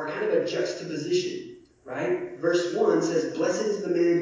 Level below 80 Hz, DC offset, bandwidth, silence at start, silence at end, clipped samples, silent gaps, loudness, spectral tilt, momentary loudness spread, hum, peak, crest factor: -70 dBFS; under 0.1%; 7.6 kHz; 0 s; 0 s; under 0.1%; none; -26 LUFS; -5 dB/octave; 9 LU; none; -10 dBFS; 16 dB